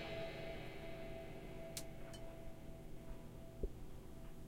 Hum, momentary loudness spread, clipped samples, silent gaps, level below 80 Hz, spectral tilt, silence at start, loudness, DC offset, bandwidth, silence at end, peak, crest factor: none; 8 LU; under 0.1%; none; -54 dBFS; -5 dB/octave; 0 s; -52 LUFS; under 0.1%; 16.5 kHz; 0 s; -26 dBFS; 22 dB